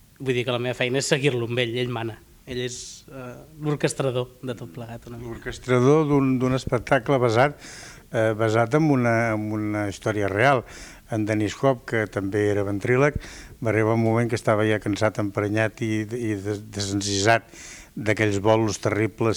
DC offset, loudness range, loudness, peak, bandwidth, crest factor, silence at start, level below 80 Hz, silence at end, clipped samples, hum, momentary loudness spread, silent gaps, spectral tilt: under 0.1%; 5 LU; -23 LUFS; -6 dBFS; 19.5 kHz; 18 dB; 0.2 s; -50 dBFS; 0 s; under 0.1%; none; 16 LU; none; -5.5 dB/octave